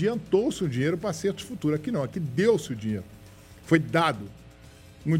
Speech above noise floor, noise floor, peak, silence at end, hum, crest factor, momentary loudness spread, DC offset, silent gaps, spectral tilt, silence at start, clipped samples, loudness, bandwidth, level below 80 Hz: 23 dB; -49 dBFS; -4 dBFS; 0 s; none; 22 dB; 12 LU; under 0.1%; none; -6.5 dB/octave; 0 s; under 0.1%; -27 LUFS; 16 kHz; -56 dBFS